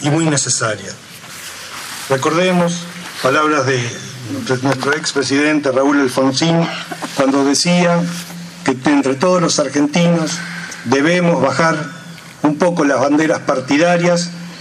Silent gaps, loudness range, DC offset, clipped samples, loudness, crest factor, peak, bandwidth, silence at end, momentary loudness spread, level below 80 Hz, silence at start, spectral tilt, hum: none; 3 LU; under 0.1%; under 0.1%; -15 LUFS; 16 dB; 0 dBFS; 15 kHz; 0 s; 13 LU; -60 dBFS; 0 s; -4.5 dB/octave; none